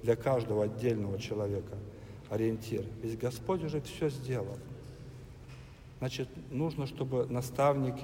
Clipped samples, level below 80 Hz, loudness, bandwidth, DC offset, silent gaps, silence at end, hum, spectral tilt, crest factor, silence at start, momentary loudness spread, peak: under 0.1%; -56 dBFS; -34 LUFS; 16 kHz; under 0.1%; none; 0 s; none; -7 dB/octave; 20 dB; 0 s; 19 LU; -14 dBFS